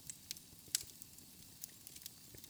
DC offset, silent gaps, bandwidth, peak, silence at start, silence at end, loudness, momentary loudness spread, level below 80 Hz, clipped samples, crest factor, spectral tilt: under 0.1%; none; over 20 kHz; -14 dBFS; 0 s; 0 s; -47 LUFS; 13 LU; -74 dBFS; under 0.1%; 36 dB; 0 dB/octave